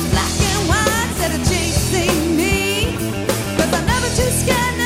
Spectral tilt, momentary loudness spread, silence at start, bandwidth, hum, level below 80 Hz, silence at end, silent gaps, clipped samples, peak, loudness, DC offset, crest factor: -4 dB/octave; 4 LU; 0 s; 16 kHz; none; -28 dBFS; 0 s; none; under 0.1%; -2 dBFS; -17 LUFS; under 0.1%; 16 dB